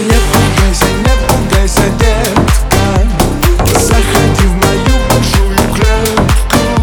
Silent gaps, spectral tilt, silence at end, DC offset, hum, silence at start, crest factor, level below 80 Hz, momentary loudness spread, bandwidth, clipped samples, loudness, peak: none; -5 dB/octave; 0 s; under 0.1%; none; 0 s; 8 dB; -12 dBFS; 2 LU; over 20 kHz; 0.3%; -10 LUFS; 0 dBFS